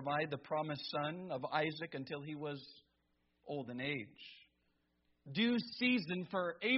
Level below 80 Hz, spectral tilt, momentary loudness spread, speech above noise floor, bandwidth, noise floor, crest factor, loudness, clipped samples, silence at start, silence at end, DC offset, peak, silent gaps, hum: -80 dBFS; -3 dB/octave; 12 LU; 41 dB; 5.8 kHz; -80 dBFS; 20 dB; -39 LUFS; under 0.1%; 0 s; 0 s; under 0.1%; -20 dBFS; none; none